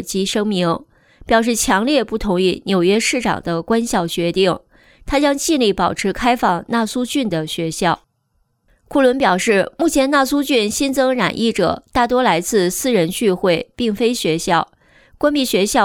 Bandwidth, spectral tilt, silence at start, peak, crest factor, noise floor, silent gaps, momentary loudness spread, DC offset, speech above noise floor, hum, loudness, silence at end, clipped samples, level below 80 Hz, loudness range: over 20 kHz; -4 dB/octave; 0 s; -2 dBFS; 14 dB; -65 dBFS; none; 5 LU; under 0.1%; 48 dB; none; -17 LUFS; 0 s; under 0.1%; -42 dBFS; 2 LU